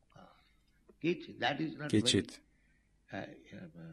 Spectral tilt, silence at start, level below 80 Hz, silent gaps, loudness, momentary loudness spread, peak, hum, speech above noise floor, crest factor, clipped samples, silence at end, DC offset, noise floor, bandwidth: -4 dB/octave; 0.2 s; -64 dBFS; none; -34 LUFS; 21 LU; -16 dBFS; none; 35 dB; 22 dB; under 0.1%; 0 s; under 0.1%; -71 dBFS; 12.5 kHz